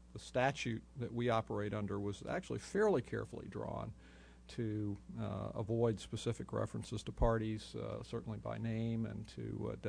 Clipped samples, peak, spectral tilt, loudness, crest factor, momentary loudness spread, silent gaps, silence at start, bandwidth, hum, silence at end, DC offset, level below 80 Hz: under 0.1%; -20 dBFS; -6.5 dB/octave; -40 LUFS; 20 dB; 10 LU; none; 0 s; 10.5 kHz; none; 0 s; under 0.1%; -52 dBFS